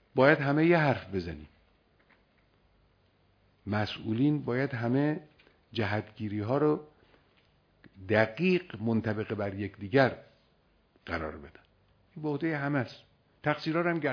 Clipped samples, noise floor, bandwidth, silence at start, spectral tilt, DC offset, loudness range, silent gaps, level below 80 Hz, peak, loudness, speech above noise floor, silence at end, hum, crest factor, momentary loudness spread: under 0.1%; -68 dBFS; 5.4 kHz; 0.15 s; -8.5 dB/octave; under 0.1%; 5 LU; none; -62 dBFS; -8 dBFS; -30 LUFS; 39 dB; 0 s; none; 22 dB; 15 LU